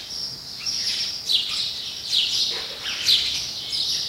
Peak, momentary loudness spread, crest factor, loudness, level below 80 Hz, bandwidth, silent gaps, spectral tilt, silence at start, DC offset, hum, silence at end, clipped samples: -6 dBFS; 10 LU; 20 dB; -22 LUFS; -56 dBFS; 16 kHz; none; 0.5 dB/octave; 0 s; under 0.1%; none; 0 s; under 0.1%